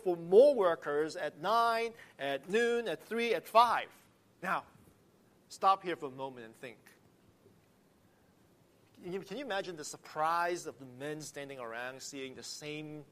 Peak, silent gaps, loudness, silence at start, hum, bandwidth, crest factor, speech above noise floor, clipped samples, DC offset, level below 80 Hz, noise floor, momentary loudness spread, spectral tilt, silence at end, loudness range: -12 dBFS; none; -33 LUFS; 0.05 s; none; 15 kHz; 22 dB; 34 dB; under 0.1%; under 0.1%; -80 dBFS; -67 dBFS; 17 LU; -4 dB/octave; 0.1 s; 14 LU